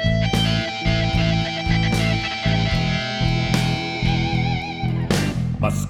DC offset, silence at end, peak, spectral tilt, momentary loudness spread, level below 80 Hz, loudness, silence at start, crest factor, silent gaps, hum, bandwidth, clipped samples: under 0.1%; 0 s; -4 dBFS; -5.5 dB/octave; 3 LU; -30 dBFS; -21 LUFS; 0 s; 16 dB; none; none; 15 kHz; under 0.1%